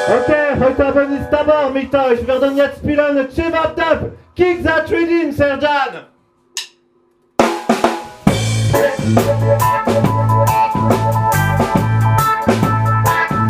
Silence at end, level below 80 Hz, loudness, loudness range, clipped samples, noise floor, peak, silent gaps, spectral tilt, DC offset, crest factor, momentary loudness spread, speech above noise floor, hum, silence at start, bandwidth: 0 s; -36 dBFS; -15 LUFS; 4 LU; under 0.1%; -56 dBFS; 0 dBFS; none; -6 dB/octave; under 0.1%; 14 dB; 4 LU; 42 dB; none; 0 s; 16 kHz